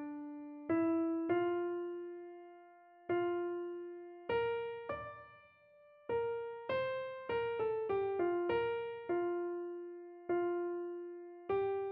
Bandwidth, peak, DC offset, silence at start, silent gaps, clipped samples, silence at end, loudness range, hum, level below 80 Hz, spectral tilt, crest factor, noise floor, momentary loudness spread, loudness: 4.6 kHz; -24 dBFS; under 0.1%; 0 s; none; under 0.1%; 0 s; 3 LU; none; -72 dBFS; -4.5 dB/octave; 14 dB; -64 dBFS; 14 LU; -38 LUFS